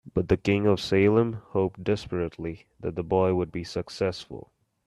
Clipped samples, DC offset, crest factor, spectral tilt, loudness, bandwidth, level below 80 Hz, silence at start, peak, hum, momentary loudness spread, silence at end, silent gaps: under 0.1%; under 0.1%; 18 dB; -7 dB/octave; -26 LUFS; 12 kHz; -52 dBFS; 0.05 s; -8 dBFS; none; 14 LU; 0.45 s; none